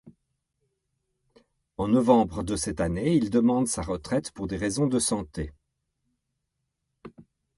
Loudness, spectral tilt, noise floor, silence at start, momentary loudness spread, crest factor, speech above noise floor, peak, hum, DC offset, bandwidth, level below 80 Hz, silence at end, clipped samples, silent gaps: -26 LUFS; -5.5 dB/octave; -80 dBFS; 0.05 s; 12 LU; 22 dB; 56 dB; -6 dBFS; none; under 0.1%; 11.5 kHz; -48 dBFS; 0.35 s; under 0.1%; none